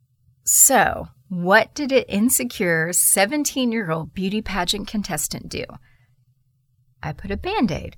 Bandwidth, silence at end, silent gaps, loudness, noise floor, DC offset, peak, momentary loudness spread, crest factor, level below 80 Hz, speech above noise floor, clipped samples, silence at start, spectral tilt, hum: 19 kHz; 0.05 s; none; -19 LUFS; -63 dBFS; under 0.1%; -2 dBFS; 18 LU; 20 dB; -44 dBFS; 42 dB; under 0.1%; 0.45 s; -2.5 dB/octave; none